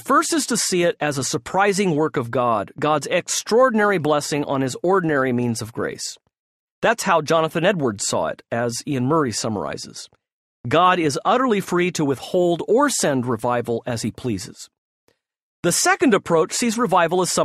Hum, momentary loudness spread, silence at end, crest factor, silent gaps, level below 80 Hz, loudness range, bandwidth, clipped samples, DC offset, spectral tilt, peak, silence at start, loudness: none; 9 LU; 0 s; 16 dB; 6.39-6.82 s, 10.32-10.64 s, 14.78-15.07 s, 15.42-15.63 s; -58 dBFS; 3 LU; 14.5 kHz; under 0.1%; under 0.1%; -4 dB/octave; -4 dBFS; 0.05 s; -20 LUFS